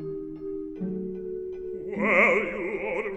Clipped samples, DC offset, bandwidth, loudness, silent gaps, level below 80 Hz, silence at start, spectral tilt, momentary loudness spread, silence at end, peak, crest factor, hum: under 0.1%; under 0.1%; 8.4 kHz; -27 LUFS; none; -54 dBFS; 0 s; -7 dB/octave; 16 LU; 0 s; -8 dBFS; 20 dB; none